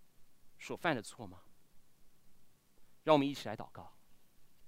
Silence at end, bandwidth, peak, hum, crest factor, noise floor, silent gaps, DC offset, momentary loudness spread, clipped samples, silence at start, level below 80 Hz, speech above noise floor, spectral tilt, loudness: 0 s; 16 kHz; -14 dBFS; none; 26 dB; -59 dBFS; none; under 0.1%; 22 LU; under 0.1%; 0 s; -70 dBFS; 23 dB; -5.5 dB/octave; -35 LUFS